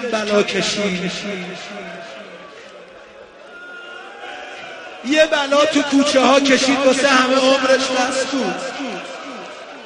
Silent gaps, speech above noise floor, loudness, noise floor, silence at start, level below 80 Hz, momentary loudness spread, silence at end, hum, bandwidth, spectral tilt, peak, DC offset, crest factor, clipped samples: none; 24 dB; -16 LUFS; -40 dBFS; 0 s; -58 dBFS; 21 LU; 0 s; none; 10.5 kHz; -3 dB/octave; 0 dBFS; under 0.1%; 18 dB; under 0.1%